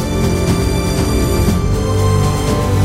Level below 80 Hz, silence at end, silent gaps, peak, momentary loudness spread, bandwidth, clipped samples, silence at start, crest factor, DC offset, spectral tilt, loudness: -22 dBFS; 0 s; none; -2 dBFS; 2 LU; 16 kHz; under 0.1%; 0 s; 12 dB; under 0.1%; -6 dB/octave; -15 LUFS